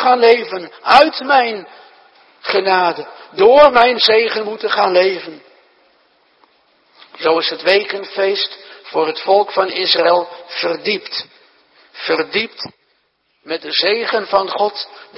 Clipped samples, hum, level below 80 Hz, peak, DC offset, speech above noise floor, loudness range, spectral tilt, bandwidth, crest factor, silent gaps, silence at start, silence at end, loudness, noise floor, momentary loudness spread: under 0.1%; none; -56 dBFS; 0 dBFS; under 0.1%; 48 dB; 7 LU; -4.5 dB/octave; 11 kHz; 16 dB; none; 0 s; 0.15 s; -14 LUFS; -63 dBFS; 16 LU